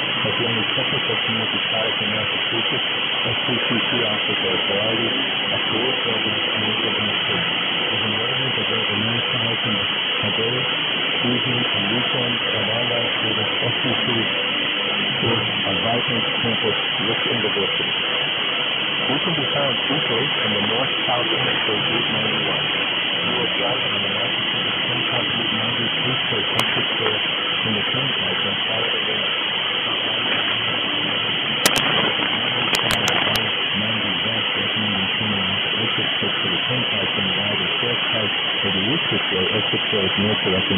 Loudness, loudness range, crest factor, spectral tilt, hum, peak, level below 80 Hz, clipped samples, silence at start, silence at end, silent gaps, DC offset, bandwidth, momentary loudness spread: -19 LUFS; 1 LU; 20 dB; -3.5 dB/octave; none; 0 dBFS; -56 dBFS; under 0.1%; 0 s; 0 s; none; under 0.1%; 11 kHz; 1 LU